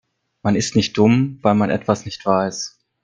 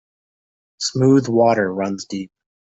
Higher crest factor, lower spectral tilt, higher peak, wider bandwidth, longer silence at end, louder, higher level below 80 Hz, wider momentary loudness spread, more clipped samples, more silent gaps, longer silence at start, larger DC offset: about the same, 18 dB vs 16 dB; about the same, -5.5 dB/octave vs -5.5 dB/octave; first, 0 dBFS vs -4 dBFS; first, 9.4 kHz vs 8 kHz; about the same, 0.35 s vs 0.4 s; about the same, -18 LUFS vs -18 LUFS; first, -54 dBFS vs -60 dBFS; second, 10 LU vs 15 LU; neither; neither; second, 0.45 s vs 0.8 s; neither